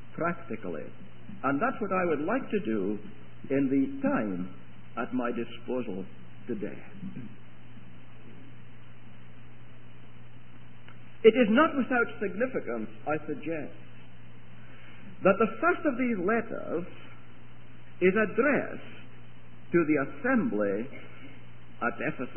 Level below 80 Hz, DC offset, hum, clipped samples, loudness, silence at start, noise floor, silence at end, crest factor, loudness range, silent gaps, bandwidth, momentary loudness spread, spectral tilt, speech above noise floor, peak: -64 dBFS; 1%; none; under 0.1%; -29 LUFS; 0.1 s; -52 dBFS; 0 s; 24 dB; 11 LU; none; 3.3 kHz; 24 LU; -10.5 dB/octave; 23 dB; -6 dBFS